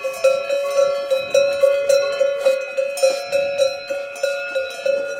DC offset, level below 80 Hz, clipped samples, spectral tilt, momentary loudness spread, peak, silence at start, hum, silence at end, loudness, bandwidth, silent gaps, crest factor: under 0.1%; -64 dBFS; under 0.1%; -1 dB/octave; 7 LU; -4 dBFS; 0 s; none; 0 s; -19 LUFS; 16 kHz; none; 16 dB